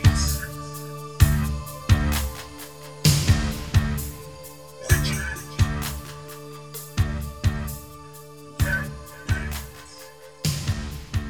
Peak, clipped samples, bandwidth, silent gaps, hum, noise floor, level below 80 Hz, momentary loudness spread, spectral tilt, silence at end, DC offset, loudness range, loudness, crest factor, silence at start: -2 dBFS; under 0.1%; over 20 kHz; none; none; -44 dBFS; -30 dBFS; 19 LU; -4.5 dB/octave; 0 s; 0.3%; 6 LU; -25 LUFS; 22 dB; 0 s